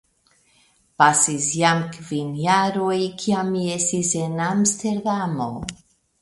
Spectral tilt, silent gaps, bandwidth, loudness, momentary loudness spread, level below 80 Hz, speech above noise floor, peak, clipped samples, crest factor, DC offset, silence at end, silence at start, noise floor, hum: -3.5 dB/octave; none; 11.5 kHz; -21 LUFS; 10 LU; -56 dBFS; 40 dB; 0 dBFS; under 0.1%; 22 dB; under 0.1%; 0.5 s; 1 s; -61 dBFS; none